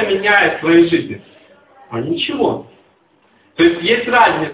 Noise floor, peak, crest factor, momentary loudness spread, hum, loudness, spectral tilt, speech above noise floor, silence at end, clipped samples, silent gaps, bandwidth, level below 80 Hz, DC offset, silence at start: -55 dBFS; 0 dBFS; 16 dB; 16 LU; none; -14 LUFS; -9 dB/octave; 41 dB; 0 s; under 0.1%; none; 4 kHz; -52 dBFS; under 0.1%; 0 s